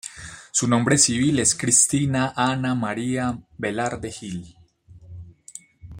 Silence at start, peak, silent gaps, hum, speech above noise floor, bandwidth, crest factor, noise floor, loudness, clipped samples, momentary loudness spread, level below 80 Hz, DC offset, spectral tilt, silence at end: 0.05 s; -2 dBFS; none; none; 27 dB; 16 kHz; 22 dB; -49 dBFS; -21 LUFS; under 0.1%; 23 LU; -54 dBFS; under 0.1%; -3.5 dB/octave; 0 s